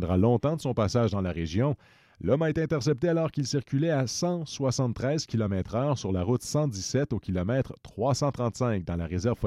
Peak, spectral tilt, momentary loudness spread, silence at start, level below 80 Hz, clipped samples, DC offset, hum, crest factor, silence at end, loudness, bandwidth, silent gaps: -12 dBFS; -6.5 dB/octave; 4 LU; 0 s; -50 dBFS; under 0.1%; under 0.1%; none; 16 dB; 0 s; -28 LUFS; 13.5 kHz; none